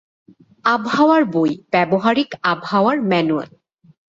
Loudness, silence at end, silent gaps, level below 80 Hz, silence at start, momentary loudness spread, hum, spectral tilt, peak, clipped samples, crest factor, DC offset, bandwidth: -17 LUFS; 0.7 s; none; -62 dBFS; 0.65 s; 7 LU; none; -6.5 dB/octave; -2 dBFS; under 0.1%; 16 dB; under 0.1%; 7.6 kHz